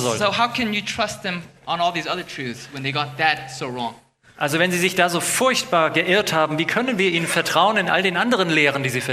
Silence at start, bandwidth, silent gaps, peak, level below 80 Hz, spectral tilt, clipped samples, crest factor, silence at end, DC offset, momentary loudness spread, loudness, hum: 0 s; 15 kHz; none; -2 dBFS; -58 dBFS; -3.5 dB/octave; under 0.1%; 18 dB; 0 s; under 0.1%; 11 LU; -20 LUFS; none